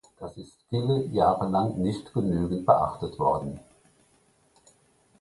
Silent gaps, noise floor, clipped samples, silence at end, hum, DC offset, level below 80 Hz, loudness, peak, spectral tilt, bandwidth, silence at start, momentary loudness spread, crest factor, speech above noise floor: none; -64 dBFS; under 0.1%; 1.6 s; none; under 0.1%; -50 dBFS; -26 LUFS; -6 dBFS; -8.5 dB/octave; 11.5 kHz; 0.2 s; 19 LU; 22 dB; 38 dB